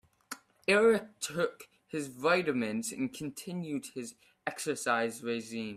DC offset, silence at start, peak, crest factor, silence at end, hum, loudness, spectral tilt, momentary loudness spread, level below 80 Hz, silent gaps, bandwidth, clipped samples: under 0.1%; 0.3 s; -12 dBFS; 20 dB; 0 s; none; -32 LUFS; -4 dB/octave; 15 LU; -74 dBFS; none; 15 kHz; under 0.1%